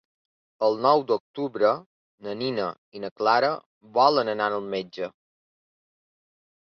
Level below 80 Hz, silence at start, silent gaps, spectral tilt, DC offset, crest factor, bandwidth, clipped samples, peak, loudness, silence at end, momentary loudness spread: -72 dBFS; 0.6 s; 1.20-1.34 s, 1.86-2.18 s, 2.78-2.92 s, 3.11-3.16 s, 3.66-3.81 s; -6 dB/octave; under 0.1%; 22 dB; 6.6 kHz; under 0.1%; -4 dBFS; -24 LUFS; 1.65 s; 15 LU